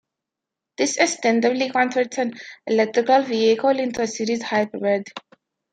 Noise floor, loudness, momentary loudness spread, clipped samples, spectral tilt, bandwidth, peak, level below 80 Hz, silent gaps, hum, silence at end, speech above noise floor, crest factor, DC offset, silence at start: -85 dBFS; -21 LUFS; 8 LU; under 0.1%; -3.5 dB/octave; 9.4 kHz; -2 dBFS; -68 dBFS; none; none; 0.55 s; 65 dB; 20 dB; under 0.1%; 0.8 s